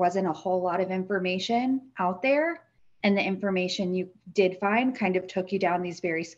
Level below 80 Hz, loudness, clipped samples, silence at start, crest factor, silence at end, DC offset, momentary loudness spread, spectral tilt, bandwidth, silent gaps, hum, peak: -70 dBFS; -27 LUFS; under 0.1%; 0 s; 18 dB; 0.05 s; under 0.1%; 6 LU; -6 dB/octave; 8 kHz; none; none; -10 dBFS